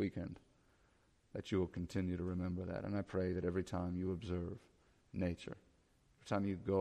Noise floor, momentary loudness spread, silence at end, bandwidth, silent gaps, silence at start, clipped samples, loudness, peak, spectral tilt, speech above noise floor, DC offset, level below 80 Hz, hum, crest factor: -73 dBFS; 12 LU; 0 s; 10.5 kHz; none; 0 s; under 0.1%; -42 LUFS; -24 dBFS; -8 dB/octave; 33 dB; under 0.1%; -62 dBFS; none; 18 dB